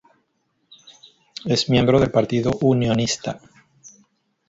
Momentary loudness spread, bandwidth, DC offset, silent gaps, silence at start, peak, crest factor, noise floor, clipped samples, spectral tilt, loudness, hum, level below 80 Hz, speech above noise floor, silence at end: 16 LU; 8 kHz; under 0.1%; none; 1.45 s; -4 dBFS; 18 dB; -70 dBFS; under 0.1%; -5.5 dB/octave; -19 LUFS; none; -46 dBFS; 51 dB; 0.6 s